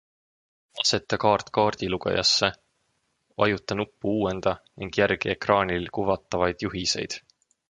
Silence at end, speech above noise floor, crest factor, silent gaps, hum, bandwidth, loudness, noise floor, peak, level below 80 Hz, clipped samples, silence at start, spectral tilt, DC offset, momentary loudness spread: 0.5 s; 48 dB; 22 dB; none; none; 11 kHz; -25 LUFS; -73 dBFS; -4 dBFS; -52 dBFS; under 0.1%; 0.75 s; -3.5 dB/octave; under 0.1%; 7 LU